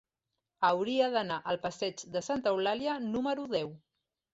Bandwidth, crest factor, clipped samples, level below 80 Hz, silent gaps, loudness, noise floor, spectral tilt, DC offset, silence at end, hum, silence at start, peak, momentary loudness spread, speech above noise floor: 8 kHz; 18 dB; under 0.1%; -70 dBFS; none; -32 LUFS; -87 dBFS; -4.5 dB/octave; under 0.1%; 0.55 s; none; 0.6 s; -14 dBFS; 6 LU; 56 dB